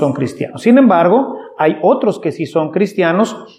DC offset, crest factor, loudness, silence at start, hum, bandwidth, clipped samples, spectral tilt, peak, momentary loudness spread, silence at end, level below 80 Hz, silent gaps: under 0.1%; 14 dB; -14 LUFS; 0 s; none; 11 kHz; under 0.1%; -7 dB/octave; 0 dBFS; 10 LU; 0.1 s; -66 dBFS; none